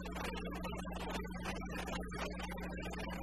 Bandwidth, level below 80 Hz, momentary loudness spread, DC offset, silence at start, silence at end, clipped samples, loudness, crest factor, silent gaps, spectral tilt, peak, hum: 13.5 kHz; -48 dBFS; 1 LU; 0.2%; 0 s; 0 s; under 0.1%; -43 LUFS; 14 dB; none; -5 dB/octave; -28 dBFS; none